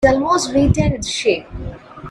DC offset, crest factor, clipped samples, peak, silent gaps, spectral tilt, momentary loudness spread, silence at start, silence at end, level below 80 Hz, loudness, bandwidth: under 0.1%; 16 dB; under 0.1%; 0 dBFS; none; -5 dB/octave; 17 LU; 0 s; 0 s; -30 dBFS; -17 LUFS; 12.5 kHz